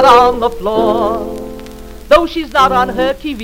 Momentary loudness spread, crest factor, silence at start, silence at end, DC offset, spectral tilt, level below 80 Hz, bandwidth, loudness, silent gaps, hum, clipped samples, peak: 19 LU; 12 dB; 0 s; 0 s; under 0.1%; -5 dB/octave; -32 dBFS; 16.5 kHz; -12 LUFS; none; none; 0.4%; 0 dBFS